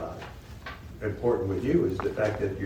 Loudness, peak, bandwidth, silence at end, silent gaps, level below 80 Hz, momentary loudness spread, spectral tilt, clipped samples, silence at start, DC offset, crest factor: -28 LUFS; -12 dBFS; 19.5 kHz; 0 s; none; -46 dBFS; 16 LU; -8 dB/octave; under 0.1%; 0 s; under 0.1%; 16 dB